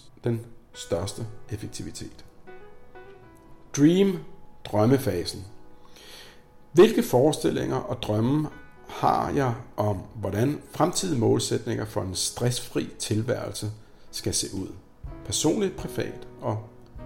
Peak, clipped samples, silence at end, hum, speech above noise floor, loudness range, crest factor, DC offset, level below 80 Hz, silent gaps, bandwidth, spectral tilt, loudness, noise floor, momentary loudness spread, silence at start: -8 dBFS; under 0.1%; 0 s; none; 24 dB; 6 LU; 20 dB; under 0.1%; -52 dBFS; none; 16.5 kHz; -5.5 dB/octave; -26 LUFS; -49 dBFS; 19 LU; 0.05 s